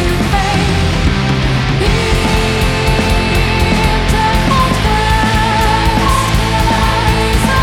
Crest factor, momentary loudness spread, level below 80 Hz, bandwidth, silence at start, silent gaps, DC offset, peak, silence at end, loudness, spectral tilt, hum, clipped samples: 12 dB; 2 LU; -18 dBFS; 17 kHz; 0 s; none; under 0.1%; 0 dBFS; 0 s; -12 LUFS; -5 dB/octave; none; under 0.1%